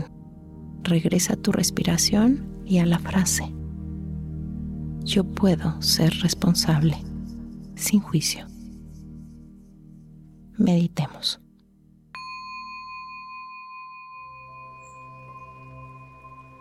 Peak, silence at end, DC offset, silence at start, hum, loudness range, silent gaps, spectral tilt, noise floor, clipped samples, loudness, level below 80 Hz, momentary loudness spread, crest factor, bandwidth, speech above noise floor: -8 dBFS; 0.05 s; under 0.1%; 0 s; none; 16 LU; none; -4.5 dB/octave; -56 dBFS; under 0.1%; -23 LUFS; -44 dBFS; 23 LU; 18 dB; 16 kHz; 34 dB